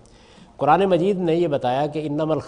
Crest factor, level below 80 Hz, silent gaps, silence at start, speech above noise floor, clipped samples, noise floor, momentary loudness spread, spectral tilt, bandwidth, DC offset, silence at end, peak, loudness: 18 dB; -54 dBFS; none; 0.6 s; 29 dB; under 0.1%; -48 dBFS; 7 LU; -7.5 dB/octave; 10.5 kHz; under 0.1%; 0 s; -4 dBFS; -20 LUFS